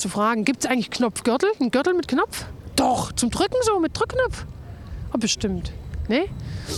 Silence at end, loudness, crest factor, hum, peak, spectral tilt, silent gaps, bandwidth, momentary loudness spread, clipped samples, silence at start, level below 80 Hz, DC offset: 0 s; -23 LUFS; 18 dB; none; -6 dBFS; -4 dB/octave; none; 15 kHz; 12 LU; under 0.1%; 0 s; -40 dBFS; under 0.1%